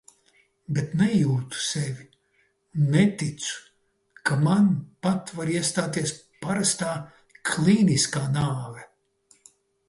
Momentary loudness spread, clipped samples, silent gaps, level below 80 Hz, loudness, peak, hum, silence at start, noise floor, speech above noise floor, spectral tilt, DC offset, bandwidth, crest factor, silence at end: 14 LU; under 0.1%; none; -60 dBFS; -25 LUFS; -6 dBFS; none; 0.7 s; -68 dBFS; 44 dB; -5 dB/octave; under 0.1%; 11.5 kHz; 18 dB; 1.05 s